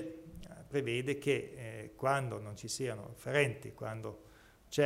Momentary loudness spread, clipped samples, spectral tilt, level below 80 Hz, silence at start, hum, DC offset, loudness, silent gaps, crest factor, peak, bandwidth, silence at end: 15 LU; under 0.1%; -5 dB/octave; -64 dBFS; 0 s; none; under 0.1%; -37 LUFS; none; 22 dB; -14 dBFS; 16 kHz; 0 s